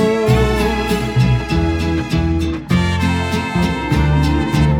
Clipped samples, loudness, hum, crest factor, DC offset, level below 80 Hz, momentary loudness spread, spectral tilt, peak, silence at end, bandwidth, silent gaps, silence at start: under 0.1%; -16 LUFS; none; 14 dB; under 0.1%; -24 dBFS; 4 LU; -6.5 dB/octave; -2 dBFS; 0 s; 17 kHz; none; 0 s